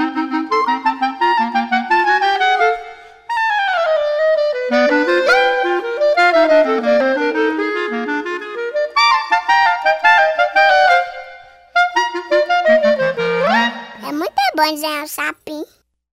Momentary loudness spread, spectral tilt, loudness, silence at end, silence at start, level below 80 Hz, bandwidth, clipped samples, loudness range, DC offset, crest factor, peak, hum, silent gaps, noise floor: 10 LU; -3.5 dB/octave; -15 LUFS; 0.45 s; 0 s; -60 dBFS; 16 kHz; under 0.1%; 3 LU; 0.1%; 14 dB; 0 dBFS; none; none; -39 dBFS